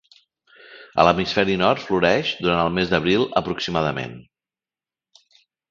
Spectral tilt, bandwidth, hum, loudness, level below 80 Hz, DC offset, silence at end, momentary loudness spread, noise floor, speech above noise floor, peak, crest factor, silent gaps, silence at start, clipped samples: -5.5 dB/octave; 7.4 kHz; none; -20 LUFS; -48 dBFS; under 0.1%; 1.5 s; 7 LU; under -90 dBFS; over 70 dB; 0 dBFS; 22 dB; none; 0.7 s; under 0.1%